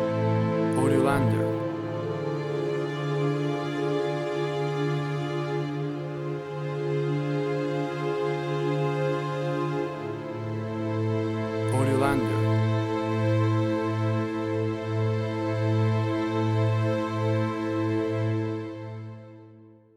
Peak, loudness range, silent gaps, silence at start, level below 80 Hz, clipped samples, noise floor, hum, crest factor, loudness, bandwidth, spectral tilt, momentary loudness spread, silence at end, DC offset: -10 dBFS; 4 LU; none; 0 s; -58 dBFS; under 0.1%; -51 dBFS; none; 18 dB; -27 LUFS; 12 kHz; -7.5 dB/octave; 8 LU; 0.25 s; under 0.1%